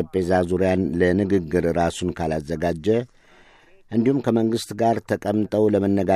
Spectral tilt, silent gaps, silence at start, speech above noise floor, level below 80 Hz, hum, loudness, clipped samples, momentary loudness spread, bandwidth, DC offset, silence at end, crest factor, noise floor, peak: -7 dB/octave; none; 0 s; 31 dB; -48 dBFS; none; -22 LUFS; under 0.1%; 6 LU; 14 kHz; under 0.1%; 0 s; 16 dB; -52 dBFS; -6 dBFS